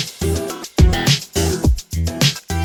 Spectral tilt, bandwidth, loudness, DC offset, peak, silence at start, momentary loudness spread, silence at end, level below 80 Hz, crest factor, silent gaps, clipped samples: -4.5 dB/octave; over 20 kHz; -18 LUFS; under 0.1%; 0 dBFS; 0 s; 8 LU; 0 s; -24 dBFS; 16 dB; none; under 0.1%